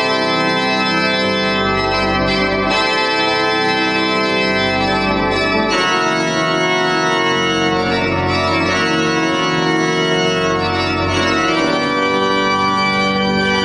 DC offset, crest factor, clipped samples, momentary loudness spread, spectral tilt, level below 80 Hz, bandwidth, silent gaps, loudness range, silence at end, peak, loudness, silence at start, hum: under 0.1%; 14 dB; under 0.1%; 1 LU; -4 dB/octave; -40 dBFS; 11.5 kHz; none; 1 LU; 0 s; -2 dBFS; -15 LUFS; 0 s; none